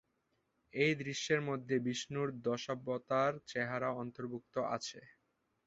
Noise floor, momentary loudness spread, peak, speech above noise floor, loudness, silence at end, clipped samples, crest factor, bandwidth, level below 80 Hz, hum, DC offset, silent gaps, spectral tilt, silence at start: -81 dBFS; 9 LU; -18 dBFS; 44 dB; -37 LUFS; 0.6 s; under 0.1%; 20 dB; 8 kHz; -76 dBFS; none; under 0.1%; none; -4 dB/octave; 0.75 s